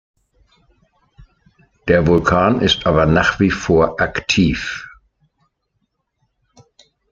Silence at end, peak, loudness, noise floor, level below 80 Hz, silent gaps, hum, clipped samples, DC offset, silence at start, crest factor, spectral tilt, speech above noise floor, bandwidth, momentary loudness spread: 2.25 s; 0 dBFS; -15 LUFS; -70 dBFS; -38 dBFS; none; none; under 0.1%; under 0.1%; 1.2 s; 18 dB; -5.5 dB/octave; 55 dB; 7.8 kHz; 10 LU